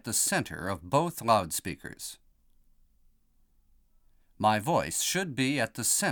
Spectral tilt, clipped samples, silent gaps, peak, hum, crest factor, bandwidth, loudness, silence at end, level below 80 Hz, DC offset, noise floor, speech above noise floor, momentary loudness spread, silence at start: -3 dB/octave; under 0.1%; none; -10 dBFS; none; 22 dB; 19.5 kHz; -28 LUFS; 0 s; -60 dBFS; under 0.1%; -66 dBFS; 37 dB; 13 LU; 0.05 s